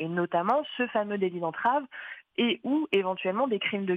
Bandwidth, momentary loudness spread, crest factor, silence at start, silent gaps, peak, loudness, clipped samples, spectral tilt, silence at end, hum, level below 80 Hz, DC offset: 5 kHz; 4 LU; 16 dB; 0 s; none; -12 dBFS; -28 LUFS; under 0.1%; -7.5 dB/octave; 0 s; none; -76 dBFS; under 0.1%